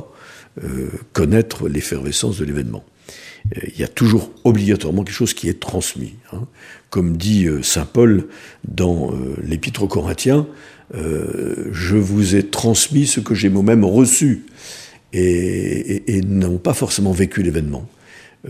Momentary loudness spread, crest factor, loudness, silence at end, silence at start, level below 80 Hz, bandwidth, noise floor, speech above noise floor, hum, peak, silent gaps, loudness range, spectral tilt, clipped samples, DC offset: 17 LU; 18 dB; -17 LUFS; 0 s; 0 s; -38 dBFS; 15.5 kHz; -41 dBFS; 24 dB; none; 0 dBFS; none; 6 LU; -5 dB/octave; under 0.1%; under 0.1%